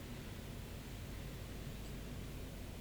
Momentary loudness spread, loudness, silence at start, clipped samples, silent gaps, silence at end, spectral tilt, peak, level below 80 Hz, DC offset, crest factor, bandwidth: 1 LU; -49 LUFS; 0 s; under 0.1%; none; 0 s; -5 dB/octave; -36 dBFS; -52 dBFS; under 0.1%; 12 dB; over 20 kHz